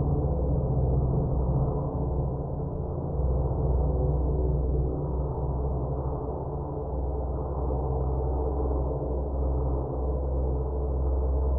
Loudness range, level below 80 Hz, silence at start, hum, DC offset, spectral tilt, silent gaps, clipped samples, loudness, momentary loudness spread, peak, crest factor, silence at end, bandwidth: 2 LU; -30 dBFS; 0 s; none; under 0.1%; -15.5 dB/octave; none; under 0.1%; -29 LUFS; 5 LU; -14 dBFS; 14 dB; 0 s; 1.6 kHz